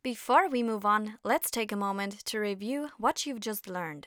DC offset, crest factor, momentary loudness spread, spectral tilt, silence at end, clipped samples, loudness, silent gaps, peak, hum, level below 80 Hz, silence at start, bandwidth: under 0.1%; 20 dB; 10 LU; -3.5 dB/octave; 0.05 s; under 0.1%; -30 LUFS; none; -10 dBFS; none; -72 dBFS; 0.05 s; over 20 kHz